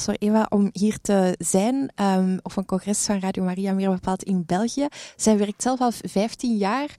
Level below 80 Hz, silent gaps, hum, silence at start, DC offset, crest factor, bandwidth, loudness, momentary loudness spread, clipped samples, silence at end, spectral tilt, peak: -54 dBFS; none; none; 0 s; under 0.1%; 16 dB; 14.5 kHz; -23 LUFS; 5 LU; under 0.1%; 0.05 s; -5.5 dB/octave; -8 dBFS